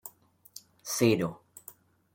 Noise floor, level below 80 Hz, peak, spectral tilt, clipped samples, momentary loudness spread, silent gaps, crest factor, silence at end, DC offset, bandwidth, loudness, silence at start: -57 dBFS; -70 dBFS; -10 dBFS; -5 dB/octave; under 0.1%; 23 LU; none; 22 dB; 0.45 s; under 0.1%; 17 kHz; -28 LUFS; 0.05 s